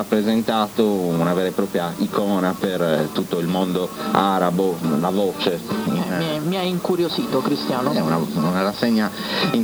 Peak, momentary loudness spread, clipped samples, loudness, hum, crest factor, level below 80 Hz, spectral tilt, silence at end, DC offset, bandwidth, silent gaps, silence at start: 0 dBFS; 4 LU; under 0.1%; -21 LUFS; none; 20 dB; -56 dBFS; -6 dB/octave; 0 s; under 0.1%; over 20 kHz; none; 0 s